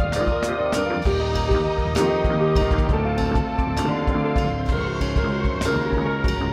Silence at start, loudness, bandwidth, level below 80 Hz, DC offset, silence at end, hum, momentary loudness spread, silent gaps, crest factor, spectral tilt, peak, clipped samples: 0 s; -22 LUFS; 12.5 kHz; -26 dBFS; under 0.1%; 0 s; none; 3 LU; none; 14 dB; -6.5 dB/octave; -6 dBFS; under 0.1%